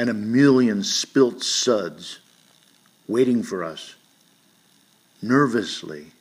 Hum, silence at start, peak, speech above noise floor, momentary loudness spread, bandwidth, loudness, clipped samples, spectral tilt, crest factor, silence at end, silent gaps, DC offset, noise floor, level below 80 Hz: none; 0 s; -4 dBFS; 38 dB; 21 LU; 15.5 kHz; -21 LUFS; under 0.1%; -4 dB/octave; 18 dB; 0.15 s; none; under 0.1%; -59 dBFS; -72 dBFS